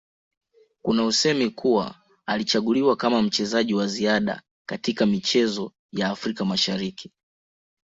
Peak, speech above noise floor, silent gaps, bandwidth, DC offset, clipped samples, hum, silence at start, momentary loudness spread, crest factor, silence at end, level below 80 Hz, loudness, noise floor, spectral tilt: -6 dBFS; over 67 dB; 4.51-4.65 s, 5.79-5.89 s; 8 kHz; under 0.1%; under 0.1%; none; 0.85 s; 12 LU; 18 dB; 0.9 s; -62 dBFS; -23 LUFS; under -90 dBFS; -4 dB/octave